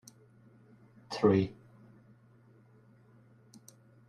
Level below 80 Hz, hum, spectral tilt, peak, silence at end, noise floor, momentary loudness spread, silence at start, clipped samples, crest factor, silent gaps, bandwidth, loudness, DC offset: -70 dBFS; none; -7 dB/octave; -12 dBFS; 2.55 s; -61 dBFS; 29 LU; 1.1 s; under 0.1%; 26 dB; none; 13.5 kHz; -30 LUFS; under 0.1%